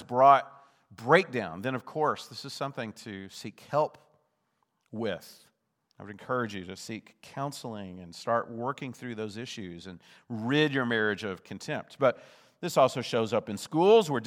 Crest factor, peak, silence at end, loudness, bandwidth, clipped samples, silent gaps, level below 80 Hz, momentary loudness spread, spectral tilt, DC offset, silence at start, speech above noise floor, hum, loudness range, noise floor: 24 dB; -6 dBFS; 0 s; -29 LUFS; 15.5 kHz; under 0.1%; none; -80 dBFS; 19 LU; -5 dB/octave; under 0.1%; 0 s; 47 dB; none; 9 LU; -76 dBFS